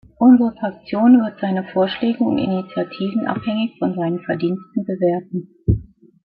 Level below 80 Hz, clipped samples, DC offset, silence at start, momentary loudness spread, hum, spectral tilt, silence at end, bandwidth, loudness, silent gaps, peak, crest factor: -40 dBFS; under 0.1%; under 0.1%; 0.2 s; 11 LU; none; -12 dB/octave; 0.55 s; 4.7 kHz; -19 LUFS; none; -2 dBFS; 16 dB